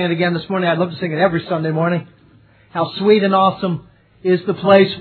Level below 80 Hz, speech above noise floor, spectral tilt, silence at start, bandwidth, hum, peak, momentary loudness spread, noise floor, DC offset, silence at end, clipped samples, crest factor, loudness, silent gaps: -56 dBFS; 33 dB; -10 dB/octave; 0 s; 4.5 kHz; none; 0 dBFS; 11 LU; -49 dBFS; under 0.1%; 0 s; under 0.1%; 16 dB; -17 LUFS; none